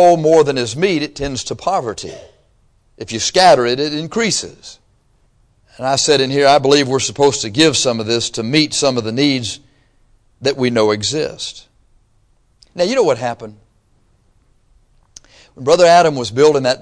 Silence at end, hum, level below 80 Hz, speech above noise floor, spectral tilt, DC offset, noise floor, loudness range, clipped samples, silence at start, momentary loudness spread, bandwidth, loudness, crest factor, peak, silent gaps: 0 s; none; -48 dBFS; 41 dB; -3.5 dB/octave; under 0.1%; -56 dBFS; 8 LU; under 0.1%; 0 s; 15 LU; 11 kHz; -14 LUFS; 16 dB; 0 dBFS; none